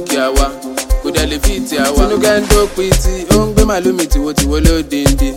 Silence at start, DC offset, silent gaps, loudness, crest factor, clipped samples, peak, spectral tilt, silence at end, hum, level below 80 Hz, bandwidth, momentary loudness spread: 0 s; under 0.1%; none; -13 LUFS; 12 dB; under 0.1%; 0 dBFS; -4.5 dB/octave; 0 s; none; -16 dBFS; 17 kHz; 5 LU